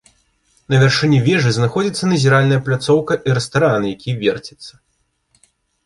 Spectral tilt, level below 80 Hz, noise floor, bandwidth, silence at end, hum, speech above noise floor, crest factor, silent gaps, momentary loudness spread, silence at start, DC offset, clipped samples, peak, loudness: -6 dB/octave; -50 dBFS; -66 dBFS; 11.5 kHz; 1.15 s; none; 51 dB; 16 dB; none; 7 LU; 0.7 s; under 0.1%; under 0.1%; 0 dBFS; -16 LUFS